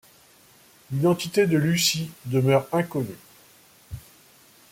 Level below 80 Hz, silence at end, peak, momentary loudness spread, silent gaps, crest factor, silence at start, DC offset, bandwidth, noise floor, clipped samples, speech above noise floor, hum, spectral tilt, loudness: -58 dBFS; 0.7 s; -8 dBFS; 21 LU; none; 18 dB; 0.9 s; under 0.1%; 16.5 kHz; -55 dBFS; under 0.1%; 32 dB; none; -5 dB/octave; -23 LUFS